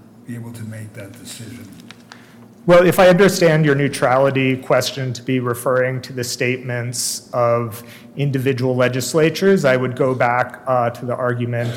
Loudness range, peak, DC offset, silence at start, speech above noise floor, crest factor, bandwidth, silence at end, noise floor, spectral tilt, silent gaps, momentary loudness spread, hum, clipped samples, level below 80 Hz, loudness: 6 LU; -4 dBFS; under 0.1%; 0.3 s; 25 dB; 14 dB; 17.5 kHz; 0 s; -43 dBFS; -5.5 dB/octave; none; 20 LU; none; under 0.1%; -52 dBFS; -17 LUFS